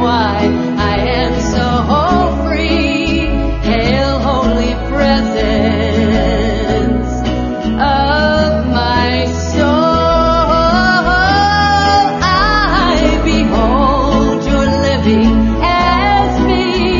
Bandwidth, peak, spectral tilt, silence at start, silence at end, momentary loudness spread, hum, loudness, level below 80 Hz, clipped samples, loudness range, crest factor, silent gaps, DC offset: 7.4 kHz; 0 dBFS; -6 dB/octave; 0 s; 0 s; 4 LU; none; -12 LUFS; -20 dBFS; under 0.1%; 3 LU; 12 dB; none; under 0.1%